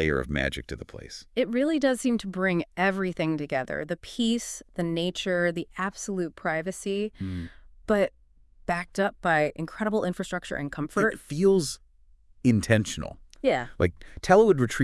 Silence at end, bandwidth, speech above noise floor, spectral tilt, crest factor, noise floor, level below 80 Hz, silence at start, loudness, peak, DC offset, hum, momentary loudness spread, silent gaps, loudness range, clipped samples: 0 s; 12 kHz; 31 dB; -5.5 dB/octave; 20 dB; -57 dBFS; -48 dBFS; 0 s; -27 LUFS; -6 dBFS; under 0.1%; none; 12 LU; none; 4 LU; under 0.1%